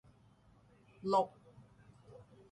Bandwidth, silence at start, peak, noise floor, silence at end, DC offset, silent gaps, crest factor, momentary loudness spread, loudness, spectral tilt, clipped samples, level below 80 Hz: 11 kHz; 1.05 s; -20 dBFS; -66 dBFS; 0.35 s; under 0.1%; none; 22 dB; 26 LU; -36 LUFS; -6.5 dB/octave; under 0.1%; -74 dBFS